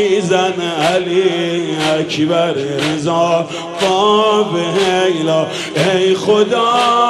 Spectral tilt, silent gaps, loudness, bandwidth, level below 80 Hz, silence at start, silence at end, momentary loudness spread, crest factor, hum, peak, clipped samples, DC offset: -4.5 dB/octave; none; -14 LUFS; 13 kHz; -56 dBFS; 0 s; 0 s; 5 LU; 12 dB; none; -2 dBFS; under 0.1%; under 0.1%